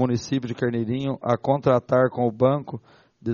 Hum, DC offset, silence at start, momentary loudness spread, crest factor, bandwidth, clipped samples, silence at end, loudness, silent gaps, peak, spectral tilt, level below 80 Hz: none; under 0.1%; 0 s; 9 LU; 18 dB; 7.2 kHz; under 0.1%; 0 s; -23 LUFS; none; -4 dBFS; -7 dB/octave; -58 dBFS